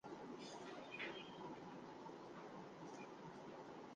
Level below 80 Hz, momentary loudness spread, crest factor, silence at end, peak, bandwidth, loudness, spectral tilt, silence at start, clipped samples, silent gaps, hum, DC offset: -86 dBFS; 6 LU; 18 dB; 0 s; -36 dBFS; 9.4 kHz; -54 LUFS; -4.5 dB/octave; 0.05 s; under 0.1%; none; none; under 0.1%